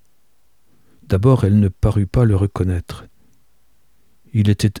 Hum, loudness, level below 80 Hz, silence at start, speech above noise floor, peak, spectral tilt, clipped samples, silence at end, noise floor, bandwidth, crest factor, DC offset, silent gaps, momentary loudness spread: none; -17 LUFS; -34 dBFS; 1.1 s; 49 dB; -2 dBFS; -8 dB/octave; under 0.1%; 0 s; -65 dBFS; 12.5 kHz; 16 dB; 0.3%; none; 11 LU